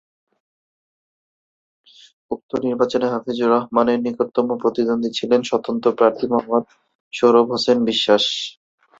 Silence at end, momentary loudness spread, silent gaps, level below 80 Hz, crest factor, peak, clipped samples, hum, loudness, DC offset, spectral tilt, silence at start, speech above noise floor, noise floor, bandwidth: 0.5 s; 8 LU; 2.43-2.49 s, 6.95-7.11 s; -62 dBFS; 18 dB; -2 dBFS; under 0.1%; none; -19 LUFS; under 0.1%; -4.5 dB/octave; 2.3 s; over 72 dB; under -90 dBFS; 7.8 kHz